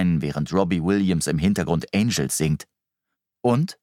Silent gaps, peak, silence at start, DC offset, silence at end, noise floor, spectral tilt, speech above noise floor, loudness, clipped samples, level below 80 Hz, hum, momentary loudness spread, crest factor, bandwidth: none; -6 dBFS; 0 s; under 0.1%; 0.1 s; -83 dBFS; -5.5 dB/octave; 61 dB; -22 LUFS; under 0.1%; -46 dBFS; none; 3 LU; 16 dB; 16 kHz